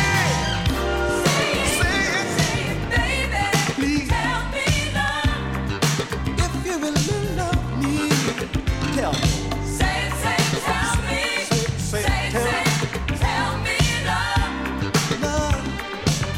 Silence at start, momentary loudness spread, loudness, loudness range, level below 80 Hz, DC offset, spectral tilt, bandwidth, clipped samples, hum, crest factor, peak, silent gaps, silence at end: 0 s; 5 LU; -22 LUFS; 2 LU; -30 dBFS; under 0.1%; -4 dB/octave; 16.5 kHz; under 0.1%; none; 18 dB; -4 dBFS; none; 0 s